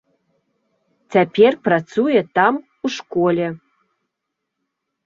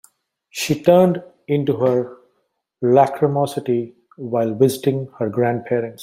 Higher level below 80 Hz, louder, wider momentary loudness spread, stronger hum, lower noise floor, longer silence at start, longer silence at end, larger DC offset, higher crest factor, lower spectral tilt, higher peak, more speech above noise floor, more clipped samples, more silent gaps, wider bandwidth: about the same, -64 dBFS vs -62 dBFS; about the same, -18 LUFS vs -19 LUFS; about the same, 12 LU vs 11 LU; neither; first, -79 dBFS vs -70 dBFS; first, 1.1 s vs 0.55 s; first, 1.5 s vs 0 s; neither; about the same, 18 dB vs 18 dB; about the same, -6.5 dB/octave vs -6.5 dB/octave; about the same, -2 dBFS vs -2 dBFS; first, 62 dB vs 52 dB; neither; neither; second, 7.4 kHz vs 16 kHz